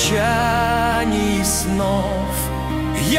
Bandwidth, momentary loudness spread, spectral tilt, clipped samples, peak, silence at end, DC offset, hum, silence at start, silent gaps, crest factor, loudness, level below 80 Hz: 16 kHz; 5 LU; -4 dB/octave; under 0.1%; -4 dBFS; 0 s; under 0.1%; none; 0 s; none; 14 dB; -19 LUFS; -30 dBFS